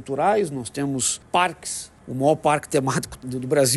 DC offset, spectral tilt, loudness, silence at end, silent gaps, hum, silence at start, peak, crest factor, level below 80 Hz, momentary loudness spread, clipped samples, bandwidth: under 0.1%; -4 dB/octave; -23 LUFS; 0 s; none; none; 0 s; -6 dBFS; 16 dB; -54 dBFS; 11 LU; under 0.1%; 13 kHz